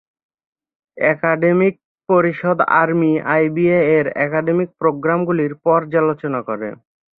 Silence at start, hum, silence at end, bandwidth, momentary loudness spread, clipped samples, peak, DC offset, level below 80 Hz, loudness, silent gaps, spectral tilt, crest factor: 0.95 s; none; 0.45 s; 4.2 kHz; 6 LU; under 0.1%; -2 dBFS; under 0.1%; -62 dBFS; -17 LUFS; 1.85-1.95 s; -11.5 dB/octave; 16 dB